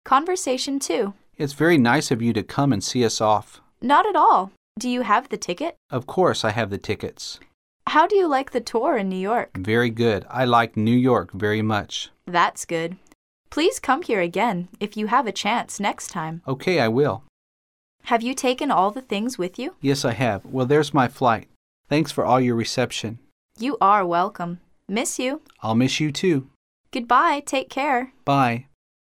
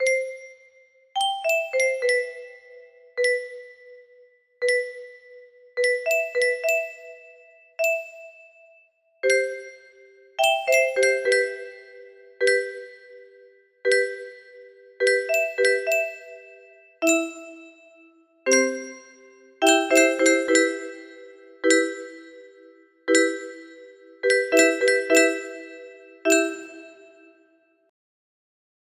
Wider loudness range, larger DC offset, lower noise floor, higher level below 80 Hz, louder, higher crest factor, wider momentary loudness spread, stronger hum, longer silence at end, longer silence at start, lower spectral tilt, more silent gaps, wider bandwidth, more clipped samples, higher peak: second, 3 LU vs 6 LU; neither; first, under -90 dBFS vs -62 dBFS; first, -58 dBFS vs -76 dBFS; about the same, -22 LUFS vs -22 LUFS; about the same, 18 dB vs 22 dB; second, 12 LU vs 23 LU; neither; second, 0.45 s vs 1.95 s; about the same, 0.05 s vs 0 s; first, -5 dB/octave vs 0 dB/octave; first, 4.57-4.75 s, 5.77-5.89 s, 7.54-7.80 s, 13.15-13.44 s, 17.29-17.99 s, 21.56-21.84 s, 23.32-23.49 s, 26.56-26.84 s vs none; about the same, 16 kHz vs 15 kHz; neither; about the same, -4 dBFS vs -4 dBFS